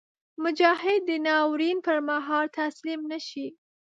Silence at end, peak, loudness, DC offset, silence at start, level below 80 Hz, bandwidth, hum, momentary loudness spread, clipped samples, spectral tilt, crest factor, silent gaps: 0.45 s; -6 dBFS; -26 LUFS; under 0.1%; 0.4 s; -82 dBFS; 7.8 kHz; none; 12 LU; under 0.1%; -3 dB/octave; 20 dB; none